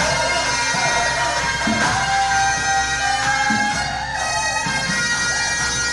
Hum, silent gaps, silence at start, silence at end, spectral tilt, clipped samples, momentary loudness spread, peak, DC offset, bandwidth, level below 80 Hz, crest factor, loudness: none; none; 0 s; 0 s; -1.5 dB/octave; under 0.1%; 3 LU; -6 dBFS; under 0.1%; 11.5 kHz; -38 dBFS; 12 dB; -18 LUFS